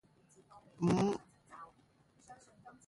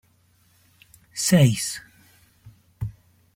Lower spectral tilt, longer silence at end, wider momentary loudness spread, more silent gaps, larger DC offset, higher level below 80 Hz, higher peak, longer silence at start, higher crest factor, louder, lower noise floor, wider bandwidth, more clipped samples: first, -7 dB/octave vs -5 dB/octave; second, 0.15 s vs 0.45 s; first, 27 LU vs 19 LU; neither; neither; second, -68 dBFS vs -54 dBFS; second, -20 dBFS vs -6 dBFS; second, 0.8 s vs 1.15 s; about the same, 20 dB vs 20 dB; second, -35 LUFS vs -22 LUFS; first, -69 dBFS vs -61 dBFS; second, 11.5 kHz vs 16.5 kHz; neither